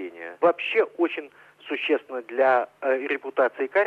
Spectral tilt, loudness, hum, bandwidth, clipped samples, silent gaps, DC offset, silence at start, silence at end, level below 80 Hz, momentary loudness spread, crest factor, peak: -5.5 dB/octave; -24 LUFS; none; 5.6 kHz; under 0.1%; none; under 0.1%; 0 s; 0 s; -82 dBFS; 10 LU; 16 dB; -8 dBFS